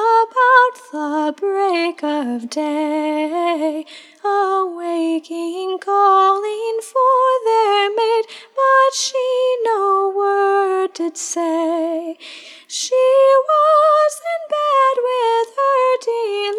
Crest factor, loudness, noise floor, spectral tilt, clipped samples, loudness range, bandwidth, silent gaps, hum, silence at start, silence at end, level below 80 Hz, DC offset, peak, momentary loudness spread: 14 dB; -17 LUFS; -38 dBFS; -1 dB/octave; under 0.1%; 5 LU; 13.5 kHz; none; none; 0 s; 0 s; -90 dBFS; under 0.1%; -2 dBFS; 11 LU